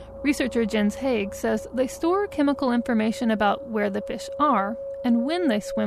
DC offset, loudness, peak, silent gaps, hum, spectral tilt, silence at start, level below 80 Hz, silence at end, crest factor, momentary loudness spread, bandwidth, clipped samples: under 0.1%; -24 LUFS; -10 dBFS; none; none; -5.5 dB/octave; 0 s; -50 dBFS; 0 s; 14 dB; 5 LU; 13.5 kHz; under 0.1%